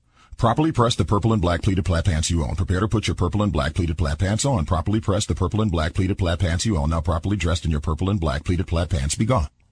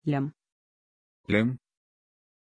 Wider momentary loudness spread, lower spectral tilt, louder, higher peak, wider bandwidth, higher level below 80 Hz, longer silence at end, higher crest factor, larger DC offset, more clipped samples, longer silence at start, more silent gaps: second, 4 LU vs 16 LU; second, -6 dB/octave vs -8.5 dB/octave; first, -22 LUFS vs -28 LUFS; first, -4 dBFS vs -10 dBFS; about the same, 10.5 kHz vs 9.8 kHz; first, -30 dBFS vs -64 dBFS; second, 0.25 s vs 0.9 s; second, 16 dB vs 22 dB; neither; neither; first, 0.3 s vs 0.05 s; second, none vs 0.52-1.24 s